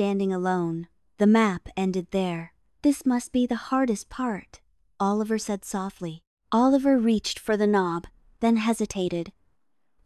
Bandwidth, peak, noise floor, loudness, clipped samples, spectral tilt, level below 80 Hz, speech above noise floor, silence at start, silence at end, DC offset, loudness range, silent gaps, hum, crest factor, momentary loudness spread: 13 kHz; -8 dBFS; -76 dBFS; -25 LUFS; under 0.1%; -5.5 dB/octave; -56 dBFS; 52 dB; 0 s; 0.75 s; under 0.1%; 3 LU; 6.27-6.37 s; none; 18 dB; 13 LU